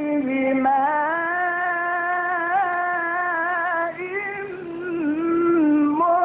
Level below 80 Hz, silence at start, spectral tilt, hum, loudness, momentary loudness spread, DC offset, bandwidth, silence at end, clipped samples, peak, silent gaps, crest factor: -64 dBFS; 0 s; -10 dB/octave; none; -22 LUFS; 8 LU; under 0.1%; 3.9 kHz; 0 s; under 0.1%; -10 dBFS; none; 12 dB